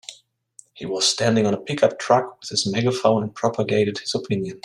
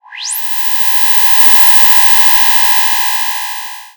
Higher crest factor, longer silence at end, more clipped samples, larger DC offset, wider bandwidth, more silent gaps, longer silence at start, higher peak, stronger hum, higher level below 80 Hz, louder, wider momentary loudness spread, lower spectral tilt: first, 20 dB vs 10 dB; about the same, 0.05 s vs 0.1 s; second, under 0.1% vs 0.4%; neither; second, 13 kHz vs over 20 kHz; neither; about the same, 0.1 s vs 0.1 s; about the same, -2 dBFS vs 0 dBFS; neither; second, -64 dBFS vs -54 dBFS; second, -21 LUFS vs -5 LUFS; second, 8 LU vs 14 LU; first, -4.5 dB/octave vs 3 dB/octave